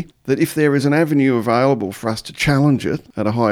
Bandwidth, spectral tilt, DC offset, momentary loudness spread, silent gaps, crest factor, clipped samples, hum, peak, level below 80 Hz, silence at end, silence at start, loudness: 16.5 kHz; -6.5 dB/octave; under 0.1%; 8 LU; none; 14 dB; under 0.1%; none; -2 dBFS; -46 dBFS; 0 s; 0 s; -17 LUFS